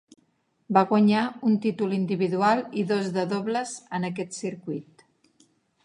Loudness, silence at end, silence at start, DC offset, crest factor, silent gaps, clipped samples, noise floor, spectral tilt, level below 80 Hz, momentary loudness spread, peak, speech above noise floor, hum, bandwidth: -25 LUFS; 1.05 s; 0.7 s; under 0.1%; 22 dB; none; under 0.1%; -69 dBFS; -6 dB/octave; -74 dBFS; 12 LU; -4 dBFS; 45 dB; none; 11 kHz